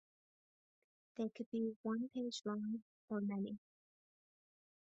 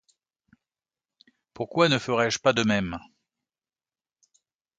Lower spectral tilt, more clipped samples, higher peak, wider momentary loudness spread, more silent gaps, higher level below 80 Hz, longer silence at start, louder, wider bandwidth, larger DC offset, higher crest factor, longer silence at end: first, -6 dB/octave vs -4.5 dB/octave; neither; second, -30 dBFS vs -6 dBFS; second, 6 LU vs 13 LU; first, 1.46-1.52 s, 1.76-1.84 s, 2.82-3.08 s vs none; second, -86 dBFS vs -58 dBFS; second, 1.2 s vs 1.6 s; second, -44 LUFS vs -24 LUFS; second, 7.4 kHz vs 9.2 kHz; neither; second, 16 dB vs 22 dB; second, 1.3 s vs 1.8 s